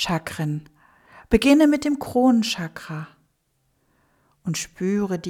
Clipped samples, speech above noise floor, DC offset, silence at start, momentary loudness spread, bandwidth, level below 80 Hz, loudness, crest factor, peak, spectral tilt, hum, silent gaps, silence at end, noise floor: under 0.1%; 48 dB; under 0.1%; 0 s; 18 LU; 17 kHz; -46 dBFS; -21 LUFS; 20 dB; -4 dBFS; -5 dB/octave; none; none; 0 s; -69 dBFS